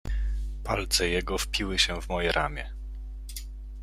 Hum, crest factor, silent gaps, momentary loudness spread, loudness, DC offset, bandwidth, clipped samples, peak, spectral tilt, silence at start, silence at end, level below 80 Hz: none; 20 dB; none; 16 LU; -28 LUFS; under 0.1%; 15 kHz; under 0.1%; -8 dBFS; -3 dB/octave; 0.05 s; 0 s; -34 dBFS